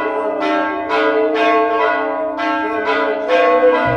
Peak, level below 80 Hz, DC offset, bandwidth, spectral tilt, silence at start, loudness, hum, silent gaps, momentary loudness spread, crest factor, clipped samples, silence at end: -2 dBFS; -52 dBFS; under 0.1%; 8.8 kHz; -5.5 dB/octave; 0 s; -16 LUFS; none; none; 6 LU; 14 dB; under 0.1%; 0 s